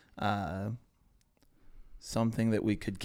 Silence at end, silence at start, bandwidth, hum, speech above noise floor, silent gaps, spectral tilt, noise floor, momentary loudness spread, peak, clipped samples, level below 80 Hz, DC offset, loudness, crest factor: 0 s; 0.15 s; 16 kHz; none; 36 dB; none; -6.5 dB/octave; -68 dBFS; 12 LU; -16 dBFS; under 0.1%; -54 dBFS; under 0.1%; -33 LUFS; 18 dB